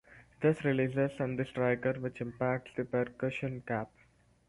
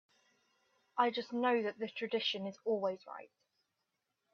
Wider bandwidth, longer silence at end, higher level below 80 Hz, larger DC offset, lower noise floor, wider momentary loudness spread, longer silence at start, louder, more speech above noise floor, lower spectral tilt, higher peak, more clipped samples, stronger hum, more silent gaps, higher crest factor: first, 11.5 kHz vs 6.8 kHz; second, 0.6 s vs 1.1 s; first, -64 dBFS vs -88 dBFS; neither; second, -66 dBFS vs -86 dBFS; second, 7 LU vs 12 LU; second, 0.1 s vs 0.95 s; first, -33 LUFS vs -36 LUFS; second, 33 dB vs 50 dB; first, -8.5 dB/octave vs -5 dB/octave; about the same, -16 dBFS vs -16 dBFS; neither; neither; neither; about the same, 18 dB vs 22 dB